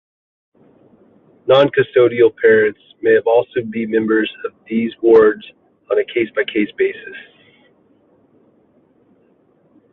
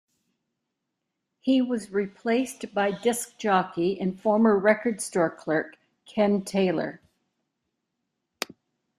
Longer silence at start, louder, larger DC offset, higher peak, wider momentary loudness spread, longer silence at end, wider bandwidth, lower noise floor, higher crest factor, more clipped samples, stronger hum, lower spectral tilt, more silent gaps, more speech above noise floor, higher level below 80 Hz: about the same, 1.45 s vs 1.45 s; first, -15 LUFS vs -26 LUFS; neither; first, -2 dBFS vs -6 dBFS; about the same, 13 LU vs 13 LU; first, 2.75 s vs 2 s; second, 4.1 kHz vs 15 kHz; second, -56 dBFS vs -82 dBFS; about the same, 16 dB vs 20 dB; neither; neither; first, -8 dB/octave vs -5 dB/octave; neither; second, 41 dB vs 57 dB; first, -60 dBFS vs -70 dBFS